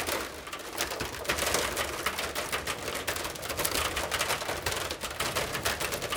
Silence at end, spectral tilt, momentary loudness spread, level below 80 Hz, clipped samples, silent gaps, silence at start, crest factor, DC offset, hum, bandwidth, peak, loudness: 0 s; -2 dB/octave; 5 LU; -50 dBFS; under 0.1%; none; 0 s; 24 dB; under 0.1%; none; 19 kHz; -8 dBFS; -31 LUFS